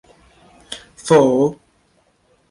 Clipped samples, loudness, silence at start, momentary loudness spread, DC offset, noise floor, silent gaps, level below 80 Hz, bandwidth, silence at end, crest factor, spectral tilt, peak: under 0.1%; -15 LUFS; 0.7 s; 21 LU; under 0.1%; -60 dBFS; none; -58 dBFS; 11.5 kHz; 0.95 s; 18 dB; -6 dB/octave; -2 dBFS